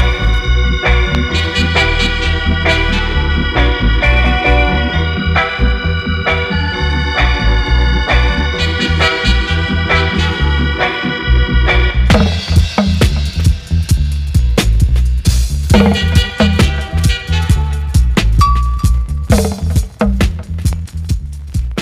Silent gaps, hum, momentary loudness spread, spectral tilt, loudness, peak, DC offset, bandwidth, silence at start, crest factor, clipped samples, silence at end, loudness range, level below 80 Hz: none; none; 5 LU; -5.5 dB/octave; -13 LUFS; 0 dBFS; under 0.1%; 14.5 kHz; 0 s; 12 dB; under 0.1%; 0 s; 1 LU; -14 dBFS